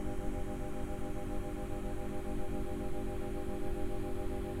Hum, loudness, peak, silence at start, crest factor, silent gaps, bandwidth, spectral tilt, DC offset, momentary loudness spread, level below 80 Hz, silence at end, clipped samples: none; -41 LUFS; -22 dBFS; 0 s; 12 dB; none; 15 kHz; -7 dB/octave; under 0.1%; 1 LU; -42 dBFS; 0 s; under 0.1%